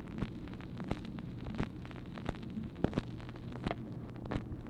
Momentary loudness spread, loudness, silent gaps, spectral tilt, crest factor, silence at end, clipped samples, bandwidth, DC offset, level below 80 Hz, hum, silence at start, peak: 9 LU; -42 LUFS; none; -8 dB/octave; 30 dB; 0 s; under 0.1%; 11.5 kHz; under 0.1%; -50 dBFS; none; 0 s; -12 dBFS